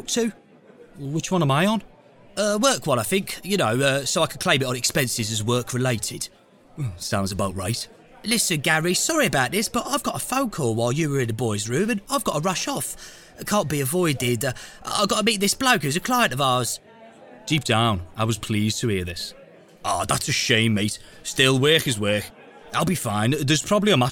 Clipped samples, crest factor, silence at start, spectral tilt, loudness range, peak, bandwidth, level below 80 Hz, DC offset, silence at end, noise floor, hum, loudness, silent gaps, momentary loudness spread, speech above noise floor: under 0.1%; 22 dB; 0 s; -4 dB/octave; 3 LU; -2 dBFS; 19 kHz; -50 dBFS; under 0.1%; 0 s; -49 dBFS; none; -22 LUFS; none; 10 LU; 27 dB